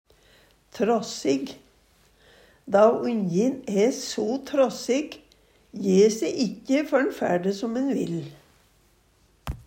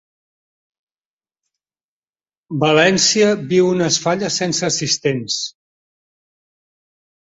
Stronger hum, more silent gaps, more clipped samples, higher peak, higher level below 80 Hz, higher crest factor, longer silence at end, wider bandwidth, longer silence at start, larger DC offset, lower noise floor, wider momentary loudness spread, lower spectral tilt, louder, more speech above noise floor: neither; neither; neither; second, -6 dBFS vs -2 dBFS; first, -54 dBFS vs -60 dBFS; about the same, 18 dB vs 18 dB; second, 0.05 s vs 1.7 s; first, 16 kHz vs 8 kHz; second, 0.75 s vs 2.5 s; neither; second, -62 dBFS vs under -90 dBFS; first, 15 LU vs 9 LU; first, -5.5 dB/octave vs -3.5 dB/octave; second, -24 LUFS vs -16 LUFS; second, 38 dB vs over 74 dB